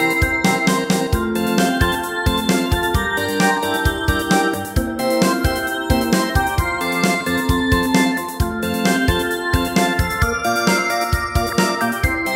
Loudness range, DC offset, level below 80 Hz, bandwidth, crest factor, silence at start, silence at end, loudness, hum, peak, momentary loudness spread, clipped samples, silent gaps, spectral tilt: 1 LU; under 0.1%; -28 dBFS; 16.5 kHz; 16 dB; 0 s; 0 s; -18 LUFS; none; -2 dBFS; 3 LU; under 0.1%; none; -4.5 dB/octave